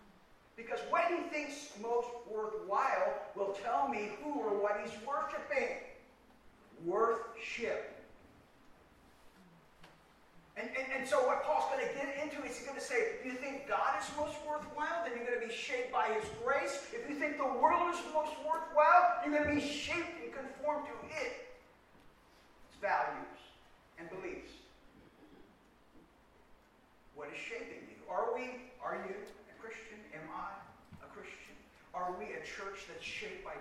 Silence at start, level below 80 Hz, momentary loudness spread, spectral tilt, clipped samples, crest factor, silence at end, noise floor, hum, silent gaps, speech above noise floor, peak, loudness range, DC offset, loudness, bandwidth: 0 s; -68 dBFS; 17 LU; -3.5 dB/octave; under 0.1%; 24 dB; 0 s; -66 dBFS; none; none; 30 dB; -14 dBFS; 15 LU; under 0.1%; -36 LUFS; 14.5 kHz